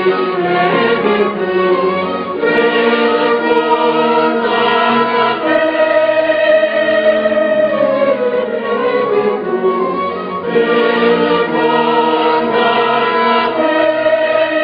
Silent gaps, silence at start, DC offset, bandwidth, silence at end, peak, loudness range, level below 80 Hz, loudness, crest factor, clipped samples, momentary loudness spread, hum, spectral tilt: none; 0 s; under 0.1%; 5.2 kHz; 0 s; -2 dBFS; 2 LU; -56 dBFS; -13 LUFS; 12 dB; under 0.1%; 4 LU; none; -8 dB/octave